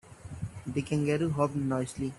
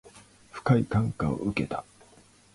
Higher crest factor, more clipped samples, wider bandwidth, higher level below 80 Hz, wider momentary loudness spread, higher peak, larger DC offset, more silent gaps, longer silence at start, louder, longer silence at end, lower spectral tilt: about the same, 18 dB vs 20 dB; neither; about the same, 12 kHz vs 11.5 kHz; second, -56 dBFS vs -50 dBFS; about the same, 13 LU vs 12 LU; second, -14 dBFS vs -10 dBFS; neither; neither; about the same, 0.05 s vs 0.05 s; second, -31 LUFS vs -28 LUFS; second, 0 s vs 0.7 s; about the same, -7 dB/octave vs -8 dB/octave